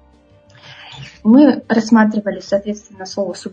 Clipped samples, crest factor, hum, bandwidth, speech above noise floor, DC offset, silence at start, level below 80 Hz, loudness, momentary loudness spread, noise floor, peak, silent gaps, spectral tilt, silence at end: under 0.1%; 16 dB; none; 8.8 kHz; 35 dB; under 0.1%; 0.7 s; -54 dBFS; -14 LUFS; 21 LU; -49 dBFS; 0 dBFS; none; -6 dB/octave; 0.05 s